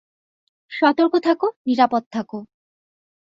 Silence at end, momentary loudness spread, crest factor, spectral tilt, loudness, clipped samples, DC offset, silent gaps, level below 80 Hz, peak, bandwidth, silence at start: 0.75 s; 16 LU; 18 dB; -6 dB/octave; -19 LUFS; under 0.1%; under 0.1%; 1.56-1.65 s, 2.06-2.11 s; -68 dBFS; -4 dBFS; 7.6 kHz; 0.7 s